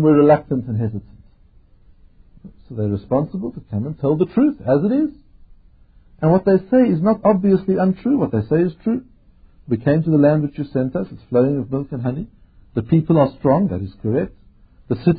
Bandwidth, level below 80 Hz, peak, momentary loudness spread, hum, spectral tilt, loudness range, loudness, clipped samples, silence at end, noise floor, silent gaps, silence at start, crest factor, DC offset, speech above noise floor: 4.9 kHz; -46 dBFS; -2 dBFS; 11 LU; none; -14 dB/octave; 5 LU; -19 LUFS; under 0.1%; 0 s; -50 dBFS; none; 0 s; 16 dB; under 0.1%; 33 dB